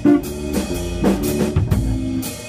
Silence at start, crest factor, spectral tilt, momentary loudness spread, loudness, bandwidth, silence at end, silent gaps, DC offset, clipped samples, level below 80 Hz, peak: 0 s; 16 dB; -6.5 dB/octave; 5 LU; -20 LUFS; 16 kHz; 0 s; none; under 0.1%; under 0.1%; -28 dBFS; -4 dBFS